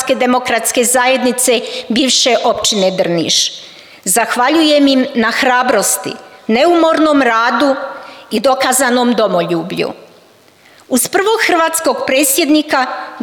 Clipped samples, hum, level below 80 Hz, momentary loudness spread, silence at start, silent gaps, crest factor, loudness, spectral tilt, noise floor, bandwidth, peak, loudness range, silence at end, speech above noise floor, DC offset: under 0.1%; none; -56 dBFS; 7 LU; 0 s; none; 12 dB; -12 LUFS; -2.5 dB/octave; -45 dBFS; over 20 kHz; -2 dBFS; 3 LU; 0 s; 33 dB; under 0.1%